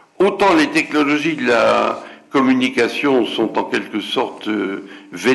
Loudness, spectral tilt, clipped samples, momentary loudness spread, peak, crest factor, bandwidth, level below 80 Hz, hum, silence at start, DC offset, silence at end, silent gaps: -17 LUFS; -4.5 dB/octave; under 0.1%; 8 LU; -6 dBFS; 10 dB; 12 kHz; -58 dBFS; none; 0.2 s; under 0.1%; 0 s; none